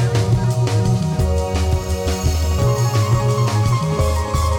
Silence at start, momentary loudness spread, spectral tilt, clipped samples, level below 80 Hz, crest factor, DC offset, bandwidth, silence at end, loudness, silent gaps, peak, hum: 0 s; 3 LU; -6 dB/octave; under 0.1%; -24 dBFS; 12 dB; under 0.1%; 17 kHz; 0 s; -18 LUFS; none; -6 dBFS; none